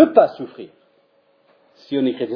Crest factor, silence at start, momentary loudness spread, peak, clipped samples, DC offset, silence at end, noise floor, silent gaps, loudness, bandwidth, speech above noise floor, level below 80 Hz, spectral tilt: 20 dB; 0 s; 25 LU; 0 dBFS; under 0.1%; under 0.1%; 0 s; -60 dBFS; none; -19 LUFS; 5.4 kHz; 41 dB; -64 dBFS; -8.5 dB/octave